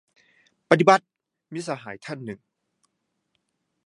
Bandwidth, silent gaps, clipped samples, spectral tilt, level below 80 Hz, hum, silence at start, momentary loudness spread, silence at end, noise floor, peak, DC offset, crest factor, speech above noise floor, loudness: 11.5 kHz; none; under 0.1%; -5.5 dB/octave; -70 dBFS; none; 0.7 s; 21 LU; 1.5 s; -77 dBFS; 0 dBFS; under 0.1%; 26 dB; 55 dB; -21 LUFS